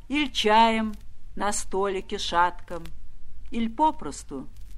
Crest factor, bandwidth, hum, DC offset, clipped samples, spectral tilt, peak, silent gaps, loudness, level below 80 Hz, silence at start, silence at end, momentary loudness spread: 20 dB; 13 kHz; none; under 0.1%; under 0.1%; -3 dB/octave; -6 dBFS; none; -25 LUFS; -42 dBFS; 0 s; 0 s; 20 LU